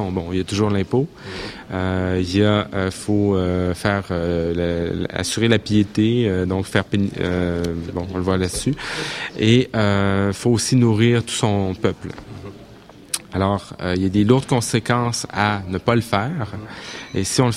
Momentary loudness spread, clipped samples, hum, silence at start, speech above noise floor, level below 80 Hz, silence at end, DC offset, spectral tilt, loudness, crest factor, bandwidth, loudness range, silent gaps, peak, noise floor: 11 LU; under 0.1%; none; 0 s; 23 dB; -44 dBFS; 0 s; under 0.1%; -5.5 dB/octave; -20 LUFS; 18 dB; 15 kHz; 3 LU; none; 0 dBFS; -43 dBFS